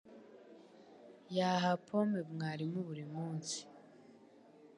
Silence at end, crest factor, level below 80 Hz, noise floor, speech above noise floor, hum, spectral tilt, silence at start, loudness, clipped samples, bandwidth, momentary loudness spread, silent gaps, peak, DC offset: 0.1 s; 20 dB; -86 dBFS; -62 dBFS; 25 dB; none; -5.5 dB/octave; 0.05 s; -38 LUFS; under 0.1%; 11 kHz; 25 LU; none; -20 dBFS; under 0.1%